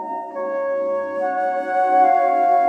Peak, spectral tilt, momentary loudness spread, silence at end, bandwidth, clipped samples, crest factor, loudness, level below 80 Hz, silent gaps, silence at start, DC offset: -6 dBFS; -5.5 dB/octave; 10 LU; 0 s; 5.8 kHz; under 0.1%; 12 dB; -19 LUFS; -78 dBFS; none; 0 s; under 0.1%